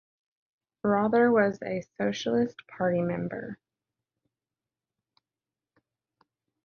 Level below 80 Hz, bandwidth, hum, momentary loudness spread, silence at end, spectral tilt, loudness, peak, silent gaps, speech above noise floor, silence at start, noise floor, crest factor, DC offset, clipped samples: -68 dBFS; 7 kHz; none; 13 LU; 3.1 s; -6.5 dB/octave; -27 LUFS; -12 dBFS; none; over 63 dB; 0.85 s; under -90 dBFS; 18 dB; under 0.1%; under 0.1%